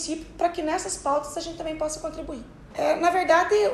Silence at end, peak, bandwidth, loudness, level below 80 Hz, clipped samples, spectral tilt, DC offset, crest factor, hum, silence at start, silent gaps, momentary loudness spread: 0 s; -6 dBFS; 13.5 kHz; -25 LUFS; -48 dBFS; under 0.1%; -3 dB/octave; under 0.1%; 18 dB; none; 0 s; none; 16 LU